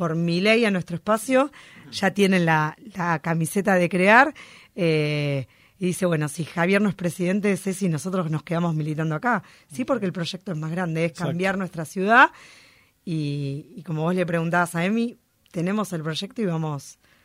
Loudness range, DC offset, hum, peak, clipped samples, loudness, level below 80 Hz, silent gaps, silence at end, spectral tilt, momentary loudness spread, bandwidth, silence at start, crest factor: 5 LU; under 0.1%; none; -2 dBFS; under 0.1%; -23 LUFS; -64 dBFS; none; 0.35 s; -6 dB/octave; 12 LU; 16 kHz; 0 s; 22 dB